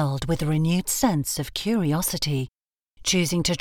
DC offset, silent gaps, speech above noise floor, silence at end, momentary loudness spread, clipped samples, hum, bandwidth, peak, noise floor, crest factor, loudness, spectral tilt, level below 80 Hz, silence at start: under 0.1%; none; 27 dB; 0 s; 5 LU; under 0.1%; none; 19 kHz; -8 dBFS; -51 dBFS; 16 dB; -24 LUFS; -4.5 dB/octave; -44 dBFS; 0 s